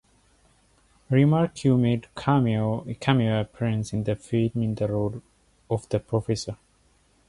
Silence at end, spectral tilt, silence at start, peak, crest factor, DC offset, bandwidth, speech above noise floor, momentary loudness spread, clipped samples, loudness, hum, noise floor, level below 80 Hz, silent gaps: 0.75 s; -7.5 dB/octave; 1.1 s; -8 dBFS; 18 dB; under 0.1%; 11.5 kHz; 39 dB; 9 LU; under 0.1%; -25 LUFS; none; -63 dBFS; -52 dBFS; none